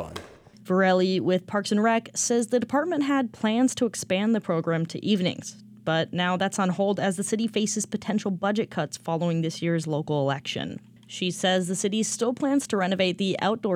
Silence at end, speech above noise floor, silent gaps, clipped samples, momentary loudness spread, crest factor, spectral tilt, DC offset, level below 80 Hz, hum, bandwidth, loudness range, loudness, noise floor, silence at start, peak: 0 s; 21 dB; none; under 0.1%; 6 LU; 16 dB; -4.5 dB/octave; under 0.1%; -68 dBFS; none; 15.5 kHz; 3 LU; -25 LUFS; -46 dBFS; 0 s; -10 dBFS